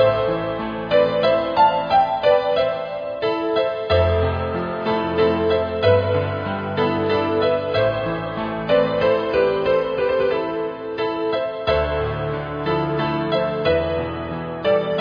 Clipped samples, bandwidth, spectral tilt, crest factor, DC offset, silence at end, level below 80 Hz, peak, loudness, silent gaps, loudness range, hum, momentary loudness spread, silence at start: under 0.1%; 5.2 kHz; -8 dB/octave; 16 dB; under 0.1%; 0 s; -42 dBFS; -4 dBFS; -20 LUFS; none; 3 LU; none; 8 LU; 0 s